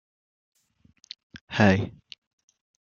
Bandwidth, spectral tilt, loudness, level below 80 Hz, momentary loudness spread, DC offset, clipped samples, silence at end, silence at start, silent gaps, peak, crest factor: 7.2 kHz; -6.5 dB/octave; -24 LUFS; -62 dBFS; 24 LU; under 0.1%; under 0.1%; 1.05 s; 1.35 s; 1.41-1.47 s; -4 dBFS; 26 dB